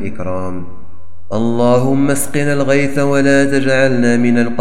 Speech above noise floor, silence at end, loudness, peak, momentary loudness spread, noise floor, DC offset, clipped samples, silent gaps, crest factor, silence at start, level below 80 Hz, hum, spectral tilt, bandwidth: 28 dB; 0 s; -14 LUFS; 0 dBFS; 11 LU; -42 dBFS; 10%; under 0.1%; none; 14 dB; 0 s; -46 dBFS; none; -6 dB/octave; 16 kHz